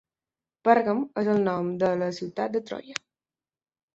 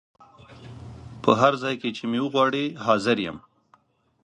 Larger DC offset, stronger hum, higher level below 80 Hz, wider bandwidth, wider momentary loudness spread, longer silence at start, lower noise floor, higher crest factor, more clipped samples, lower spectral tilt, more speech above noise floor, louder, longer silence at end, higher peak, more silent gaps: neither; neither; second, -70 dBFS vs -58 dBFS; second, 8 kHz vs 10 kHz; second, 13 LU vs 23 LU; first, 0.65 s vs 0.5 s; first, under -90 dBFS vs -62 dBFS; about the same, 22 dB vs 24 dB; neither; about the same, -6.5 dB/octave vs -5.5 dB/octave; first, over 65 dB vs 39 dB; second, -26 LUFS vs -23 LUFS; first, 1 s vs 0.85 s; about the same, -4 dBFS vs -2 dBFS; neither